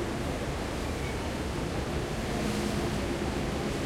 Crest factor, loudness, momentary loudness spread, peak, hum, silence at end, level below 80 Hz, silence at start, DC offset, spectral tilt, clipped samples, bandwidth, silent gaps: 14 dB; -32 LUFS; 3 LU; -18 dBFS; none; 0 s; -40 dBFS; 0 s; under 0.1%; -5.5 dB/octave; under 0.1%; 16.5 kHz; none